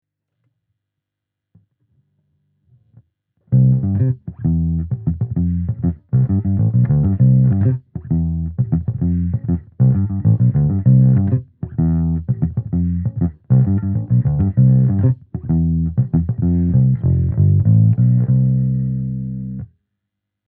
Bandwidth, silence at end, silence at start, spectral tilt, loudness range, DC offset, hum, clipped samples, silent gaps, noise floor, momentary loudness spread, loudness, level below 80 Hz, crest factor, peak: 2 kHz; 0.9 s; 3.5 s; -15 dB/octave; 4 LU; under 0.1%; none; under 0.1%; none; -82 dBFS; 9 LU; -17 LUFS; -34 dBFS; 14 dB; -2 dBFS